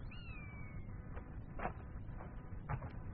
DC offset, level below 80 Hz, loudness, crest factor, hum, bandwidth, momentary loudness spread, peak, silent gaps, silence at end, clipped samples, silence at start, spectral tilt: under 0.1%; -50 dBFS; -49 LUFS; 24 dB; none; 4.5 kHz; 5 LU; -24 dBFS; none; 0 s; under 0.1%; 0 s; -6.5 dB/octave